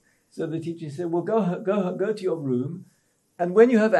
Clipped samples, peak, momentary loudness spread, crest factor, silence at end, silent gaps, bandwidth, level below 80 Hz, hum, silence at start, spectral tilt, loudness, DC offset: under 0.1%; -4 dBFS; 16 LU; 20 dB; 0 s; none; 10.5 kHz; -78 dBFS; none; 0.35 s; -8 dB/octave; -25 LUFS; under 0.1%